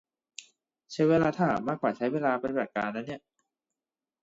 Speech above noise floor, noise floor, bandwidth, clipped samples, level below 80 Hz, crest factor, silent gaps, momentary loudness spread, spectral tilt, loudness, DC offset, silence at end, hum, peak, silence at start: over 62 dB; under -90 dBFS; 7.8 kHz; under 0.1%; -64 dBFS; 18 dB; none; 23 LU; -7 dB/octave; -28 LUFS; under 0.1%; 1.05 s; none; -12 dBFS; 0.4 s